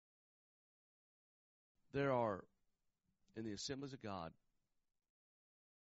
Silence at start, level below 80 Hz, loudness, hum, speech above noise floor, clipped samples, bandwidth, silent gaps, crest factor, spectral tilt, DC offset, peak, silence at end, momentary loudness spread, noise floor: 1.95 s; -78 dBFS; -44 LUFS; none; 43 dB; under 0.1%; 7.6 kHz; none; 22 dB; -4.5 dB/octave; under 0.1%; -26 dBFS; 1.55 s; 13 LU; -87 dBFS